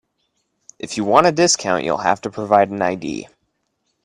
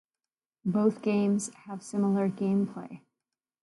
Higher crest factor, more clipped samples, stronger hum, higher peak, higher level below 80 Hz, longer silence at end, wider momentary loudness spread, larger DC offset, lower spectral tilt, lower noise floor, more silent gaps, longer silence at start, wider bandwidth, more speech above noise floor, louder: about the same, 20 dB vs 18 dB; neither; neither; first, 0 dBFS vs -12 dBFS; first, -58 dBFS vs -76 dBFS; first, 0.8 s vs 0.65 s; about the same, 14 LU vs 13 LU; neither; second, -3.5 dB/octave vs -7 dB/octave; second, -71 dBFS vs under -90 dBFS; neither; first, 0.85 s vs 0.65 s; about the same, 11.5 kHz vs 11.5 kHz; second, 53 dB vs over 62 dB; first, -17 LUFS vs -29 LUFS